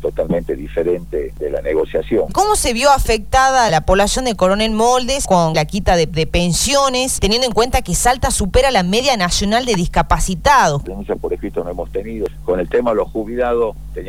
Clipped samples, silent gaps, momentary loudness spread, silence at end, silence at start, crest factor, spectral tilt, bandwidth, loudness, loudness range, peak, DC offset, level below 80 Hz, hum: under 0.1%; none; 10 LU; 0 s; 0 s; 14 dB; -3.5 dB/octave; 19.5 kHz; -16 LUFS; 3 LU; -2 dBFS; 2%; -26 dBFS; none